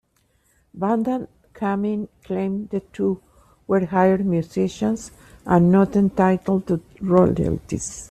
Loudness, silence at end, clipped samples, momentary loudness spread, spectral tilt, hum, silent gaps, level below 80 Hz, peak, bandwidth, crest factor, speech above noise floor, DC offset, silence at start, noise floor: -21 LUFS; 0.05 s; under 0.1%; 12 LU; -7.5 dB/octave; none; none; -48 dBFS; -4 dBFS; 9.8 kHz; 18 dB; 44 dB; under 0.1%; 0.75 s; -64 dBFS